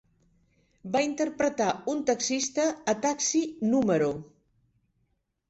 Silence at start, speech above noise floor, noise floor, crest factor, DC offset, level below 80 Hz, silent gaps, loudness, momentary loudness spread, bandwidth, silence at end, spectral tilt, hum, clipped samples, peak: 0.85 s; 48 dB; -75 dBFS; 16 dB; under 0.1%; -66 dBFS; none; -27 LUFS; 4 LU; 8.2 kHz; 1.25 s; -3.5 dB/octave; none; under 0.1%; -12 dBFS